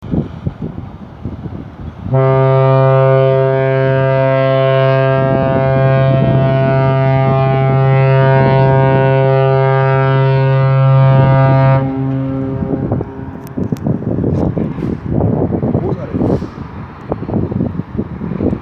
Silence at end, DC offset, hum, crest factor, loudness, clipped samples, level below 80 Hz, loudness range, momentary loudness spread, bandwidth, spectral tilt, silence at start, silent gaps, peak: 0 s; under 0.1%; none; 12 dB; -13 LUFS; under 0.1%; -34 dBFS; 7 LU; 15 LU; 4.9 kHz; -10 dB/octave; 0 s; none; 0 dBFS